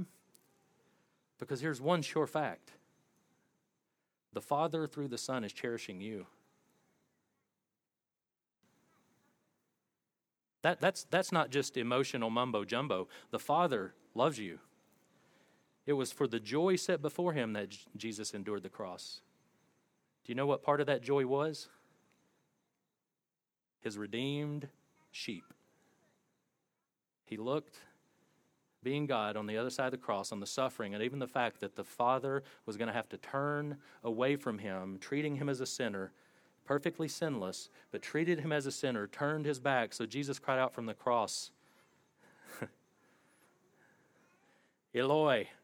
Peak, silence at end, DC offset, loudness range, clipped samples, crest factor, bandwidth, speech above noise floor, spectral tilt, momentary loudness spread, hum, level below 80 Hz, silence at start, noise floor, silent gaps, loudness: -14 dBFS; 0.1 s; under 0.1%; 9 LU; under 0.1%; 24 dB; 18.5 kHz; over 54 dB; -5 dB/octave; 14 LU; none; -88 dBFS; 0 s; under -90 dBFS; none; -36 LUFS